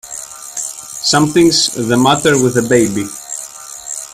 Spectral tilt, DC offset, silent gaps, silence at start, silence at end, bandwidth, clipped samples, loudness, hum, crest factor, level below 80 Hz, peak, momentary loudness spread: -3.5 dB/octave; under 0.1%; none; 0.05 s; 0 s; 15.5 kHz; under 0.1%; -13 LUFS; none; 14 dB; -48 dBFS; 0 dBFS; 15 LU